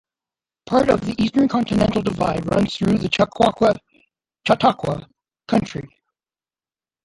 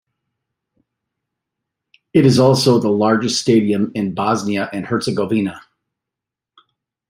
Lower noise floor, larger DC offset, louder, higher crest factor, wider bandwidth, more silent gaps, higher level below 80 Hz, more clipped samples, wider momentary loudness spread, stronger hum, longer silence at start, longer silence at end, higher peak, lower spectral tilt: first, under -90 dBFS vs -85 dBFS; neither; second, -19 LUFS vs -16 LUFS; about the same, 18 dB vs 18 dB; second, 11.5 kHz vs 16 kHz; neither; first, -46 dBFS vs -58 dBFS; neither; about the same, 10 LU vs 9 LU; neither; second, 0.7 s vs 2.15 s; second, 1.2 s vs 1.5 s; about the same, -2 dBFS vs -2 dBFS; about the same, -6.5 dB/octave vs -5.5 dB/octave